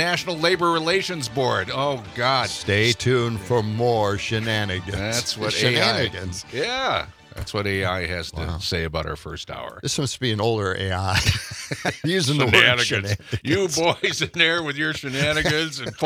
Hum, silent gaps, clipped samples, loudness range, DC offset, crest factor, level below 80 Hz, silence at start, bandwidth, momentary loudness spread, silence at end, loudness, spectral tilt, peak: none; none; under 0.1%; 6 LU; under 0.1%; 22 dB; -46 dBFS; 0 s; 18 kHz; 9 LU; 0 s; -22 LUFS; -4 dB/octave; 0 dBFS